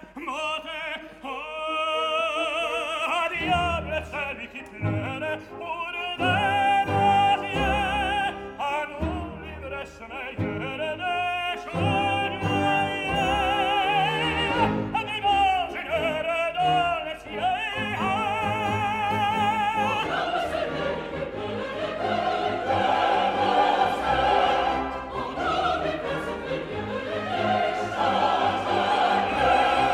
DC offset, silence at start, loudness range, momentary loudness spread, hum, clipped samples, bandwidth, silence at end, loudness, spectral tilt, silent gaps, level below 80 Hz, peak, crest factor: under 0.1%; 0 s; 4 LU; 10 LU; none; under 0.1%; 15 kHz; 0 s; -25 LUFS; -5 dB/octave; none; -46 dBFS; -8 dBFS; 16 dB